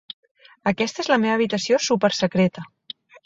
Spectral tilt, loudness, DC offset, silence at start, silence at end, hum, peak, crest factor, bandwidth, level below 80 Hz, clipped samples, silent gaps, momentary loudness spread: -4.5 dB/octave; -21 LUFS; under 0.1%; 0.65 s; 0.6 s; none; -4 dBFS; 18 dB; 7.8 kHz; -60 dBFS; under 0.1%; none; 20 LU